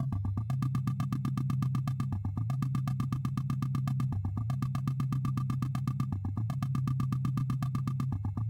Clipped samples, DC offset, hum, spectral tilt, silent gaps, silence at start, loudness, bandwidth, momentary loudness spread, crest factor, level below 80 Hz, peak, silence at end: under 0.1%; under 0.1%; none; -8 dB/octave; none; 0 s; -33 LUFS; 15.5 kHz; 2 LU; 14 dB; -50 dBFS; -18 dBFS; 0 s